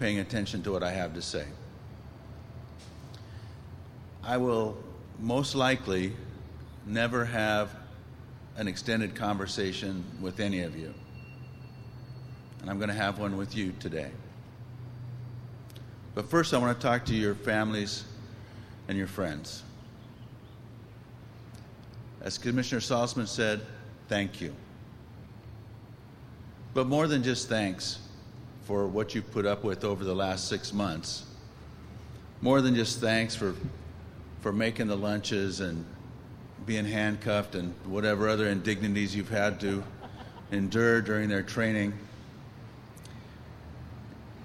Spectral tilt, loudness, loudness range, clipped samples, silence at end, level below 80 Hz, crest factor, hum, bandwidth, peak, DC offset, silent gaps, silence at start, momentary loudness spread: -5 dB/octave; -30 LUFS; 8 LU; under 0.1%; 0 s; -56 dBFS; 22 dB; none; 15.5 kHz; -10 dBFS; under 0.1%; none; 0 s; 21 LU